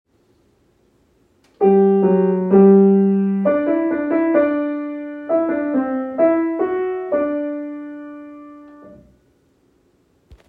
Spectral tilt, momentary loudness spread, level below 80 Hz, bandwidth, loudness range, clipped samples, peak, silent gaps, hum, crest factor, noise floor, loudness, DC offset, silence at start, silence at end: -11.5 dB/octave; 17 LU; -60 dBFS; 3.5 kHz; 11 LU; under 0.1%; -2 dBFS; none; none; 16 dB; -59 dBFS; -17 LUFS; under 0.1%; 1.6 s; 0.15 s